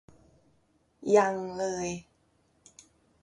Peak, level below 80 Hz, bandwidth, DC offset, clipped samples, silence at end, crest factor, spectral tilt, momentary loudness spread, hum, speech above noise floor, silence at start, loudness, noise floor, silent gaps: -10 dBFS; -66 dBFS; 10.5 kHz; under 0.1%; under 0.1%; 1.2 s; 22 dB; -5 dB/octave; 15 LU; none; 42 dB; 1 s; -28 LUFS; -69 dBFS; none